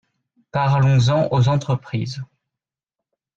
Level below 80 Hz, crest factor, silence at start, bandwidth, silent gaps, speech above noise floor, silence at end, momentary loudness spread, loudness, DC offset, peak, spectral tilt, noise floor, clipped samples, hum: -52 dBFS; 12 dB; 0.55 s; 7.6 kHz; none; 70 dB; 1.15 s; 14 LU; -19 LUFS; under 0.1%; -8 dBFS; -7 dB/octave; -87 dBFS; under 0.1%; none